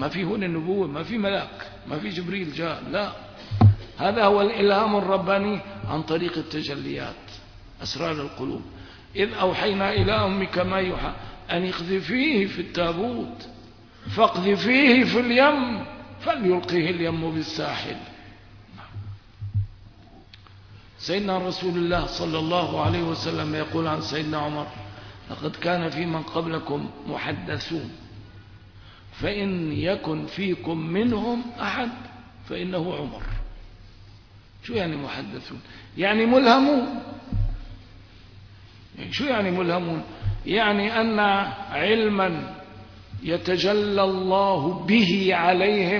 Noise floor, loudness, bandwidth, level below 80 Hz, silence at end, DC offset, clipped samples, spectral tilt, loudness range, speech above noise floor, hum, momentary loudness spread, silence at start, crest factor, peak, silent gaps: -49 dBFS; -24 LUFS; 5.4 kHz; -44 dBFS; 0 s; under 0.1%; under 0.1%; -6.5 dB/octave; 10 LU; 25 dB; none; 18 LU; 0 s; 20 dB; -4 dBFS; none